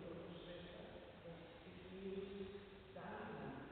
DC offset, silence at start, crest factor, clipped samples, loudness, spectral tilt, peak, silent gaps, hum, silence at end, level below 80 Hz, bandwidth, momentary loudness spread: under 0.1%; 0 s; 14 dB; under 0.1%; -54 LUFS; -5 dB/octave; -38 dBFS; none; none; 0 s; -70 dBFS; 4.5 kHz; 8 LU